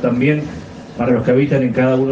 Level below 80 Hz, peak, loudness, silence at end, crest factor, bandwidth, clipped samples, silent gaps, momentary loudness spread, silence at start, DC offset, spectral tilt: -46 dBFS; -2 dBFS; -16 LUFS; 0 s; 14 dB; 7.4 kHz; under 0.1%; none; 15 LU; 0 s; under 0.1%; -8.5 dB/octave